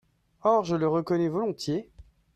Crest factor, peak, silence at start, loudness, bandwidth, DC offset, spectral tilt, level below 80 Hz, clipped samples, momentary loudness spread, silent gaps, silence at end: 18 dB; -10 dBFS; 0.45 s; -27 LUFS; 12.5 kHz; under 0.1%; -7 dB/octave; -60 dBFS; under 0.1%; 7 LU; none; 0.35 s